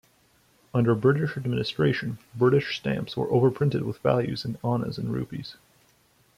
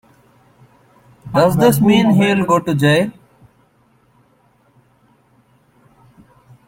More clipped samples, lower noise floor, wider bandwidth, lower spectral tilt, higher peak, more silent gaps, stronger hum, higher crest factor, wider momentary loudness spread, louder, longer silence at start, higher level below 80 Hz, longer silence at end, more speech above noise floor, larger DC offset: neither; first, -63 dBFS vs -56 dBFS; second, 14 kHz vs 16.5 kHz; first, -8 dB/octave vs -6 dB/octave; second, -8 dBFS vs -2 dBFS; neither; neither; about the same, 18 dB vs 16 dB; first, 9 LU vs 5 LU; second, -26 LUFS vs -14 LUFS; second, 0.75 s vs 1.25 s; second, -58 dBFS vs -50 dBFS; second, 0.85 s vs 3.6 s; second, 38 dB vs 43 dB; neither